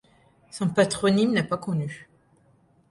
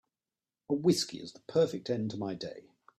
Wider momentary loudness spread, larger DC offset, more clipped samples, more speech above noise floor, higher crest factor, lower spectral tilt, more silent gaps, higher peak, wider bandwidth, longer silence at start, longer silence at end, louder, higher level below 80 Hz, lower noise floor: about the same, 16 LU vs 15 LU; neither; neither; second, 37 dB vs over 58 dB; about the same, 20 dB vs 20 dB; about the same, -5.5 dB/octave vs -5.5 dB/octave; neither; first, -6 dBFS vs -14 dBFS; second, 11.5 kHz vs 14.5 kHz; second, 0.55 s vs 0.7 s; first, 0.85 s vs 0.4 s; first, -24 LUFS vs -32 LUFS; first, -60 dBFS vs -72 dBFS; second, -61 dBFS vs under -90 dBFS